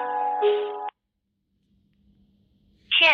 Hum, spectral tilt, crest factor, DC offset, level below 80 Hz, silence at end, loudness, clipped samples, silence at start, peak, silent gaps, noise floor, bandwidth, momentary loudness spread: none; -2 dB/octave; 20 dB; under 0.1%; -70 dBFS; 0 s; -23 LUFS; under 0.1%; 0 s; -8 dBFS; none; -78 dBFS; 6.6 kHz; 15 LU